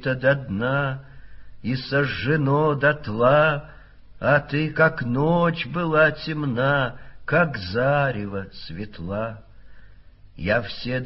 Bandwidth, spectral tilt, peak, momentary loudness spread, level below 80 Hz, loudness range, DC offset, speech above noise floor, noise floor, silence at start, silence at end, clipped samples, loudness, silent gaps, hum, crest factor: 5.8 kHz; -5 dB/octave; -4 dBFS; 13 LU; -48 dBFS; 5 LU; under 0.1%; 24 dB; -46 dBFS; 0 s; 0 s; under 0.1%; -22 LUFS; none; none; 18 dB